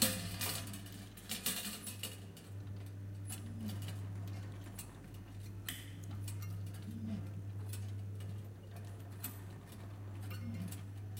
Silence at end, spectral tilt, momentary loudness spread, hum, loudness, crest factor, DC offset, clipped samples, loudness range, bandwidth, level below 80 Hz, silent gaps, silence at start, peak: 0 s; -3.5 dB/octave; 11 LU; none; -44 LUFS; 28 dB; under 0.1%; under 0.1%; 4 LU; 16.5 kHz; -64 dBFS; none; 0 s; -16 dBFS